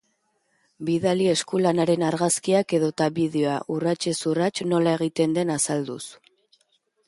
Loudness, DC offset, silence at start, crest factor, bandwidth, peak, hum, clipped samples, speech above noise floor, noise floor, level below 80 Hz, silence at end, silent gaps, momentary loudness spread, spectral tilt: -23 LUFS; under 0.1%; 0.8 s; 16 dB; 11.5 kHz; -8 dBFS; none; under 0.1%; 48 dB; -71 dBFS; -66 dBFS; 0.95 s; none; 5 LU; -5 dB/octave